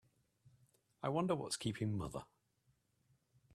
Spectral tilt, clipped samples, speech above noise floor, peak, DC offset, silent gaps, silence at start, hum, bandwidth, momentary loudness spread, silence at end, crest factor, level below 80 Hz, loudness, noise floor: -5.5 dB/octave; under 0.1%; 39 dB; -24 dBFS; under 0.1%; none; 1 s; none; 13.5 kHz; 9 LU; 1.3 s; 20 dB; -68 dBFS; -40 LUFS; -79 dBFS